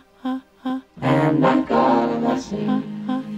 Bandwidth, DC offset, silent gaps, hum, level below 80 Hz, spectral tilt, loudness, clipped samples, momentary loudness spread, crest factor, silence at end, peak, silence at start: 8.2 kHz; under 0.1%; none; none; -54 dBFS; -7.5 dB/octave; -21 LUFS; under 0.1%; 12 LU; 14 dB; 0 s; -6 dBFS; 0.25 s